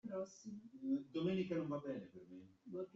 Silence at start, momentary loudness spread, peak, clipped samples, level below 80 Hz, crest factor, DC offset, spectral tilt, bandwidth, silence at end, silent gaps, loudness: 0.05 s; 17 LU; -30 dBFS; under 0.1%; -82 dBFS; 16 dB; under 0.1%; -7 dB/octave; 7.8 kHz; 0.05 s; none; -44 LUFS